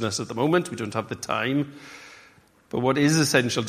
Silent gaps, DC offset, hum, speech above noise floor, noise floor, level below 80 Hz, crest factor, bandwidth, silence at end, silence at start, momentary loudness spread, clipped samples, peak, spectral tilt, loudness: none; under 0.1%; none; 31 dB; -55 dBFS; -62 dBFS; 22 dB; 15.5 kHz; 0 s; 0 s; 16 LU; under 0.1%; -4 dBFS; -4.5 dB/octave; -24 LUFS